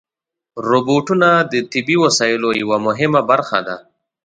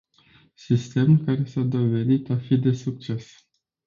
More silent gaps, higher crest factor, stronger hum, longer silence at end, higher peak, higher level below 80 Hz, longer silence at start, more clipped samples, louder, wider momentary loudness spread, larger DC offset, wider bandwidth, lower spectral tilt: neither; about the same, 16 dB vs 16 dB; neither; second, 0.45 s vs 0.65 s; first, 0 dBFS vs -8 dBFS; about the same, -60 dBFS vs -60 dBFS; second, 0.55 s vs 0.7 s; neither; first, -15 LUFS vs -23 LUFS; about the same, 10 LU vs 11 LU; neither; first, 9.4 kHz vs 7.4 kHz; second, -4.5 dB/octave vs -8.5 dB/octave